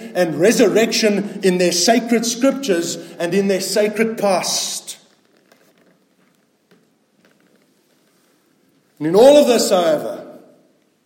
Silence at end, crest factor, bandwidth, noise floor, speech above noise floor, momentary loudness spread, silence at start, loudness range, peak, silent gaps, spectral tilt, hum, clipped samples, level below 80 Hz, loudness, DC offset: 0.7 s; 18 dB; 16.5 kHz; -60 dBFS; 44 dB; 13 LU; 0 s; 9 LU; 0 dBFS; none; -3.5 dB/octave; none; under 0.1%; -66 dBFS; -16 LUFS; under 0.1%